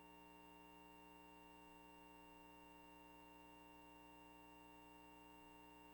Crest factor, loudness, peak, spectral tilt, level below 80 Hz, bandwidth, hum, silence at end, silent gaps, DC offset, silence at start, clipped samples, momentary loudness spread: 14 dB; -63 LUFS; -50 dBFS; -4.5 dB/octave; -78 dBFS; 17 kHz; none; 0 s; none; under 0.1%; 0 s; under 0.1%; 0 LU